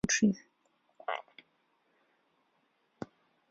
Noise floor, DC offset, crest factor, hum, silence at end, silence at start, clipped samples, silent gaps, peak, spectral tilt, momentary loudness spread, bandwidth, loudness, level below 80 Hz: -75 dBFS; under 0.1%; 24 dB; none; 0.45 s; 0.05 s; under 0.1%; none; -14 dBFS; -4 dB/octave; 20 LU; 7.6 kHz; -33 LUFS; -66 dBFS